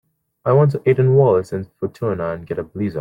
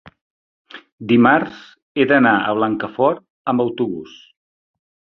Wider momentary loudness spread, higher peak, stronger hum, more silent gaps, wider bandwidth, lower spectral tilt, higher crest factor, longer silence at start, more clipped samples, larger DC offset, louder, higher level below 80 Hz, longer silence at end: about the same, 13 LU vs 15 LU; about the same, -2 dBFS vs -2 dBFS; neither; second, none vs 0.21-0.65 s, 0.92-0.98 s, 1.82-1.95 s, 3.30-3.45 s; first, 7.4 kHz vs 6.2 kHz; first, -10 dB/octave vs -8 dB/octave; about the same, 16 dB vs 18 dB; first, 0.45 s vs 0.05 s; neither; neither; about the same, -18 LUFS vs -17 LUFS; first, -54 dBFS vs -60 dBFS; second, 0 s vs 1.1 s